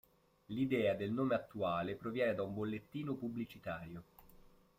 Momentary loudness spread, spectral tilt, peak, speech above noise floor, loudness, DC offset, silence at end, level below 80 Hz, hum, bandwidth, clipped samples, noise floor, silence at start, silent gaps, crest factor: 11 LU; -8 dB/octave; -22 dBFS; 25 dB; -39 LUFS; under 0.1%; 0.4 s; -70 dBFS; none; 16 kHz; under 0.1%; -63 dBFS; 0.5 s; none; 16 dB